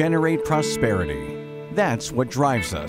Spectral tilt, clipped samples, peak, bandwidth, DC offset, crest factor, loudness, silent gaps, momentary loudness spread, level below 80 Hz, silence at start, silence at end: -5.5 dB/octave; under 0.1%; -6 dBFS; 16 kHz; under 0.1%; 18 dB; -22 LUFS; none; 9 LU; -44 dBFS; 0 s; 0 s